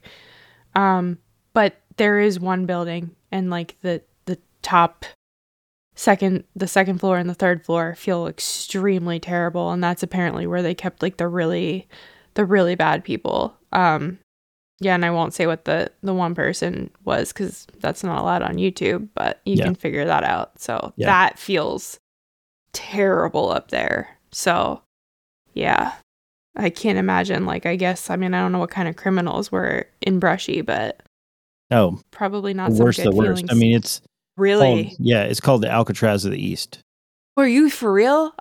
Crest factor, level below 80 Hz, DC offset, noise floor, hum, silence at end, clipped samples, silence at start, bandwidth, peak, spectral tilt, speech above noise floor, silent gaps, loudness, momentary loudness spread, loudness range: 20 dB; -54 dBFS; under 0.1%; -51 dBFS; none; 0.1 s; under 0.1%; 0.75 s; 18 kHz; -2 dBFS; -5.5 dB/octave; 31 dB; 5.15-5.91 s, 14.23-14.78 s, 21.99-22.66 s, 24.86-25.45 s, 26.03-26.54 s, 31.07-31.70 s, 36.83-37.36 s; -21 LUFS; 11 LU; 5 LU